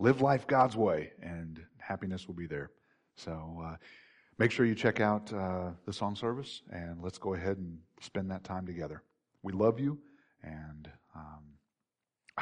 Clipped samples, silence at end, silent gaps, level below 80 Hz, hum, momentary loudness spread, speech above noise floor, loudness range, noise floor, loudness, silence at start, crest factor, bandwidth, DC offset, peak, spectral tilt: under 0.1%; 0 s; none; -62 dBFS; none; 21 LU; 56 dB; 6 LU; -89 dBFS; -34 LUFS; 0 s; 20 dB; 10.5 kHz; under 0.1%; -14 dBFS; -7 dB/octave